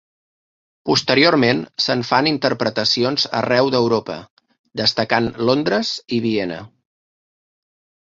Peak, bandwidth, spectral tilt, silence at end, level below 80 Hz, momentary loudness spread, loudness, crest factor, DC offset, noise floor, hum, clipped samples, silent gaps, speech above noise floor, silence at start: -2 dBFS; 7.8 kHz; -4.5 dB/octave; 1.35 s; -56 dBFS; 10 LU; -18 LUFS; 18 dB; under 0.1%; under -90 dBFS; none; under 0.1%; 4.30-4.37 s, 4.59-4.64 s; over 72 dB; 0.85 s